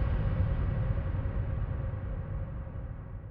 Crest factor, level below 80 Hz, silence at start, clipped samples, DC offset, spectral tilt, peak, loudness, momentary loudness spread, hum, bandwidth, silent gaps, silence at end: 14 dB; -36 dBFS; 0 s; under 0.1%; under 0.1%; -9 dB/octave; -18 dBFS; -34 LUFS; 10 LU; none; 4.2 kHz; none; 0 s